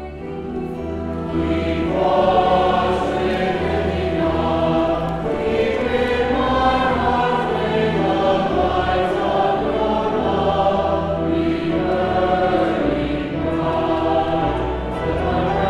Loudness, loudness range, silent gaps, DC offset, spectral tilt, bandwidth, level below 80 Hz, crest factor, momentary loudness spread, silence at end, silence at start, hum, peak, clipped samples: -19 LUFS; 1 LU; none; under 0.1%; -7.5 dB/octave; 11 kHz; -34 dBFS; 16 dB; 6 LU; 0 s; 0 s; none; -4 dBFS; under 0.1%